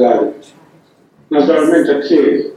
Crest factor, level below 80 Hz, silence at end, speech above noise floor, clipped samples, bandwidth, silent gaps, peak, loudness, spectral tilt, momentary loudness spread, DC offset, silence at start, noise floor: 14 dB; -64 dBFS; 0 s; 37 dB; under 0.1%; 12 kHz; none; 0 dBFS; -12 LUFS; -6 dB/octave; 6 LU; under 0.1%; 0 s; -49 dBFS